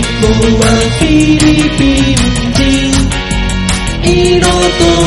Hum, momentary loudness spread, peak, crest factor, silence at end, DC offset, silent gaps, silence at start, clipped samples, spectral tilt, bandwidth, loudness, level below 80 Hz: none; 5 LU; 0 dBFS; 8 dB; 0 s; 0.4%; none; 0 s; 0.2%; -4.5 dB/octave; 12 kHz; -9 LUFS; -18 dBFS